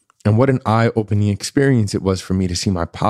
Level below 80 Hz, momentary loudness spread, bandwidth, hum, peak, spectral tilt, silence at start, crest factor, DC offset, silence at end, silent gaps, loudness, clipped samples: -42 dBFS; 4 LU; 13 kHz; none; -2 dBFS; -6.5 dB/octave; 0.25 s; 14 dB; under 0.1%; 0 s; none; -17 LUFS; under 0.1%